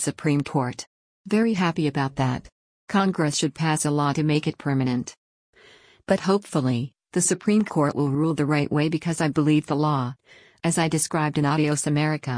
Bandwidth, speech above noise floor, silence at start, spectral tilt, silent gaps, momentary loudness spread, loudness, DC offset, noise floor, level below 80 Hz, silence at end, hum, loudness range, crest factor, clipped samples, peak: 10.5 kHz; 31 dB; 0 s; -5.5 dB/octave; 0.87-1.25 s, 2.52-2.87 s, 5.17-5.53 s; 6 LU; -23 LUFS; under 0.1%; -53 dBFS; -58 dBFS; 0 s; none; 2 LU; 16 dB; under 0.1%; -8 dBFS